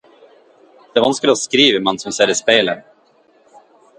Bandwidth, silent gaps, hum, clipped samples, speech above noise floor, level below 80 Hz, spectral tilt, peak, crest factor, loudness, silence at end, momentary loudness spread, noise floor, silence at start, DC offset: 11.5 kHz; none; none; under 0.1%; 39 dB; -60 dBFS; -2.5 dB/octave; 0 dBFS; 18 dB; -15 LUFS; 1.2 s; 9 LU; -54 dBFS; 0.95 s; under 0.1%